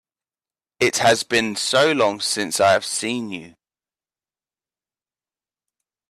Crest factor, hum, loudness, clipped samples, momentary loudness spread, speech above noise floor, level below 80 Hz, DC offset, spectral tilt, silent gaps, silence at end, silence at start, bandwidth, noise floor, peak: 20 dB; none; -19 LUFS; under 0.1%; 9 LU; over 70 dB; -64 dBFS; under 0.1%; -2.5 dB/octave; none; 2.6 s; 0.8 s; 15 kHz; under -90 dBFS; -4 dBFS